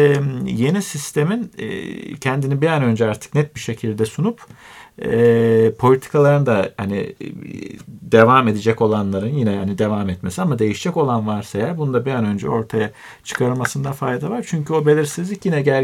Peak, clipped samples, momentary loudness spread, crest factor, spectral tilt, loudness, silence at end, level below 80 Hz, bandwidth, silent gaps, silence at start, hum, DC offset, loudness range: 0 dBFS; under 0.1%; 13 LU; 18 dB; -6.5 dB/octave; -18 LUFS; 0 s; -54 dBFS; 15.5 kHz; none; 0 s; none; under 0.1%; 4 LU